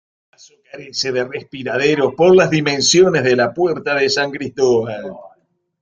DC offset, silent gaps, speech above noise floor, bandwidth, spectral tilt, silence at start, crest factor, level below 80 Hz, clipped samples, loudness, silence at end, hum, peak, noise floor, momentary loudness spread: under 0.1%; none; 42 dB; 9 kHz; -4 dB/octave; 0.75 s; 14 dB; -56 dBFS; under 0.1%; -15 LUFS; 0.55 s; none; -2 dBFS; -58 dBFS; 15 LU